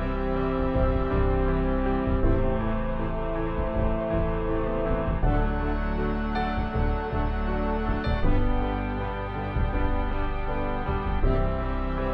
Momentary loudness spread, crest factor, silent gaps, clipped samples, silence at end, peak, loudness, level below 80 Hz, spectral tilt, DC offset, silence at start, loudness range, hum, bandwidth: 5 LU; 14 dB; none; under 0.1%; 0 s; -10 dBFS; -28 LUFS; -28 dBFS; -10 dB/octave; under 0.1%; 0 s; 2 LU; none; 5 kHz